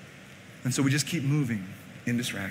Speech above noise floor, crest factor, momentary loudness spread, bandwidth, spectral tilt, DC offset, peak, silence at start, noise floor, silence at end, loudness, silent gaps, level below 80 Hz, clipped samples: 20 dB; 16 dB; 21 LU; 16 kHz; -4.5 dB/octave; under 0.1%; -14 dBFS; 0 s; -48 dBFS; 0 s; -29 LUFS; none; -66 dBFS; under 0.1%